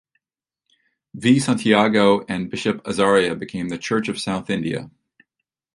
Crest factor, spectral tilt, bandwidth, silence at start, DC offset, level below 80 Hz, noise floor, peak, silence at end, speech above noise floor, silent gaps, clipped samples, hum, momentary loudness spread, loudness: 20 dB; -5 dB/octave; 11.5 kHz; 1.15 s; under 0.1%; -56 dBFS; -86 dBFS; -2 dBFS; 0.85 s; 67 dB; none; under 0.1%; none; 11 LU; -20 LUFS